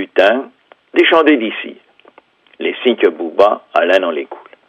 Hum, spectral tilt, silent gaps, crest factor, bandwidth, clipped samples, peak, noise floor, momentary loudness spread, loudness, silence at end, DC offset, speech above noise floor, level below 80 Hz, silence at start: none; -4.5 dB/octave; none; 16 dB; 8 kHz; under 0.1%; 0 dBFS; -49 dBFS; 14 LU; -14 LUFS; 0.3 s; under 0.1%; 36 dB; -64 dBFS; 0 s